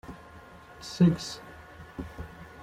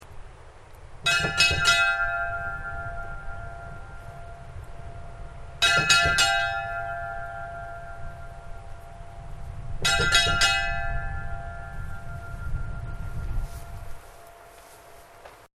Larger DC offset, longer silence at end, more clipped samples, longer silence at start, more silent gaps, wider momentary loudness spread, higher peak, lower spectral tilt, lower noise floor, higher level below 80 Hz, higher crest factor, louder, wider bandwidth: neither; about the same, 0 s vs 0.1 s; neither; about the same, 0.05 s vs 0 s; neither; about the same, 25 LU vs 24 LU; second, -12 dBFS vs -2 dBFS; first, -6.5 dB/octave vs -1.5 dB/octave; about the same, -50 dBFS vs -48 dBFS; second, -52 dBFS vs -38 dBFS; second, 20 dB vs 26 dB; second, -27 LUFS vs -23 LUFS; second, 11.5 kHz vs 16 kHz